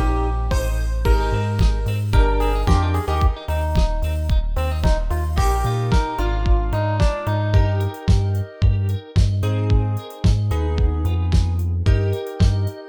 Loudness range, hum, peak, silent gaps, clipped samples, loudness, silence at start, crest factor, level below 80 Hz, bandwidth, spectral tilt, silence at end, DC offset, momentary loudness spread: 1 LU; none; -2 dBFS; none; under 0.1%; -21 LUFS; 0 s; 16 dB; -22 dBFS; 19.5 kHz; -7 dB/octave; 0 s; under 0.1%; 4 LU